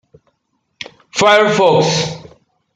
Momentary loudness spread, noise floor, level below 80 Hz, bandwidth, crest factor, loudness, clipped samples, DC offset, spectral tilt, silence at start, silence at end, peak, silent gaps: 22 LU; -68 dBFS; -56 dBFS; 9.6 kHz; 14 dB; -13 LUFS; under 0.1%; under 0.1%; -4 dB/octave; 1.15 s; 0.55 s; 0 dBFS; none